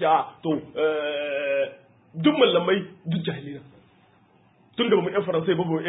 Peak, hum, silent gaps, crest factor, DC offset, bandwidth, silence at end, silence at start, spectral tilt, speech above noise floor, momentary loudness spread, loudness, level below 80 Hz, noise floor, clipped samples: -6 dBFS; none; none; 20 dB; under 0.1%; 4 kHz; 0 s; 0 s; -10.5 dB/octave; 36 dB; 14 LU; -24 LUFS; -68 dBFS; -59 dBFS; under 0.1%